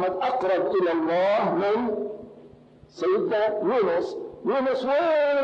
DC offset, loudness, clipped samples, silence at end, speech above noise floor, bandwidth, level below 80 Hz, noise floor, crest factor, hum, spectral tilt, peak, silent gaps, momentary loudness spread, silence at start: under 0.1%; -24 LUFS; under 0.1%; 0 s; 27 dB; 7.8 kHz; -66 dBFS; -50 dBFS; 8 dB; none; -6.5 dB/octave; -16 dBFS; none; 8 LU; 0 s